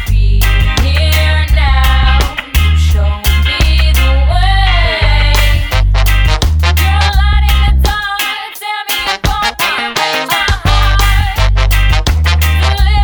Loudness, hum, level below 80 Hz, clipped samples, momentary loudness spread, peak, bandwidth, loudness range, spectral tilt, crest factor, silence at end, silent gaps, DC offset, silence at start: -11 LUFS; none; -10 dBFS; under 0.1%; 3 LU; 0 dBFS; over 20 kHz; 2 LU; -4 dB/octave; 10 dB; 0 s; none; under 0.1%; 0 s